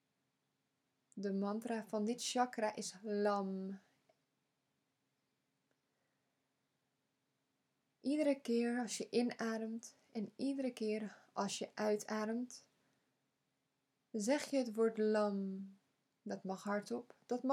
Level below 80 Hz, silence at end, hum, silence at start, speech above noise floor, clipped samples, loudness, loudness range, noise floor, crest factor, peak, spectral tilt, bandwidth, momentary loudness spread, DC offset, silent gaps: under -90 dBFS; 0 s; none; 1.15 s; 46 dB; under 0.1%; -40 LUFS; 5 LU; -85 dBFS; 20 dB; -20 dBFS; -4.5 dB/octave; 16 kHz; 12 LU; under 0.1%; none